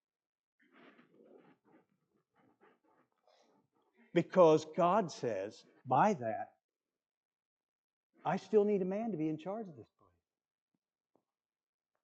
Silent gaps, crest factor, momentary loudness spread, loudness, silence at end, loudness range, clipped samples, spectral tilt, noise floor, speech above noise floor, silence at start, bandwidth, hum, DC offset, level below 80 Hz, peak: 6.64-6.69 s, 7.17-7.31 s, 7.45-8.10 s; 24 dB; 17 LU; -33 LUFS; 2.2 s; 6 LU; under 0.1%; -7 dB/octave; under -90 dBFS; over 57 dB; 4.15 s; 8.2 kHz; none; under 0.1%; -88 dBFS; -14 dBFS